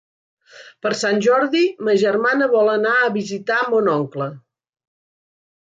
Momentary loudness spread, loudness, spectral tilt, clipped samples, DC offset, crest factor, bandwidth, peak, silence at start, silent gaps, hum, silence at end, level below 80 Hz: 9 LU; -18 LUFS; -5 dB/octave; under 0.1%; under 0.1%; 14 dB; 9.2 kHz; -6 dBFS; 0.55 s; none; none; 1.25 s; -70 dBFS